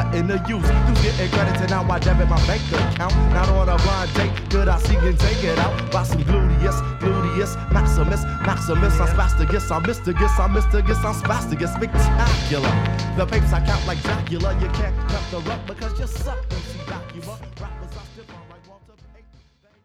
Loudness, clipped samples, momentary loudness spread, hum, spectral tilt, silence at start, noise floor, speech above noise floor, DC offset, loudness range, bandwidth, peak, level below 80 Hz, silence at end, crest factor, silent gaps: -21 LUFS; under 0.1%; 10 LU; none; -6 dB/octave; 0 s; -54 dBFS; 35 dB; under 0.1%; 10 LU; 13 kHz; -4 dBFS; -22 dBFS; 1.3 s; 14 dB; none